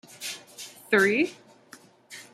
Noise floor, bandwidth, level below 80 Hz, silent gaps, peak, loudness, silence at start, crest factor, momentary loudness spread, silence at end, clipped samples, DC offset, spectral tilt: -53 dBFS; 15.5 kHz; -78 dBFS; none; -8 dBFS; -25 LUFS; 0.2 s; 22 dB; 22 LU; 0.1 s; under 0.1%; under 0.1%; -3.5 dB/octave